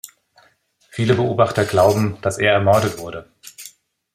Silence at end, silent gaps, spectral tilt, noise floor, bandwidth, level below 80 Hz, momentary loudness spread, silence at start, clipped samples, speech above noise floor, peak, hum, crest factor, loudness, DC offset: 0.45 s; none; -5.5 dB/octave; -58 dBFS; 16 kHz; -54 dBFS; 21 LU; 0.95 s; under 0.1%; 41 dB; -2 dBFS; none; 18 dB; -17 LUFS; under 0.1%